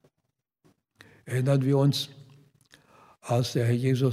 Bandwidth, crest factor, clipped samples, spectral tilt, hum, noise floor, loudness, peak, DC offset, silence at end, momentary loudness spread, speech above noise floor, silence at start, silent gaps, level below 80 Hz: 15 kHz; 16 dB; under 0.1%; -6.5 dB/octave; none; -80 dBFS; -26 LUFS; -12 dBFS; under 0.1%; 0 s; 10 LU; 56 dB; 1.25 s; none; -72 dBFS